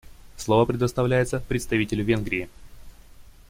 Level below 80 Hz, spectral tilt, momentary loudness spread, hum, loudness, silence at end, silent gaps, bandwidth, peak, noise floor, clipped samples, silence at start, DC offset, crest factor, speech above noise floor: -44 dBFS; -6 dB/octave; 8 LU; none; -24 LUFS; 0.2 s; none; 16.5 kHz; -8 dBFS; -47 dBFS; under 0.1%; 0.05 s; under 0.1%; 18 dB; 24 dB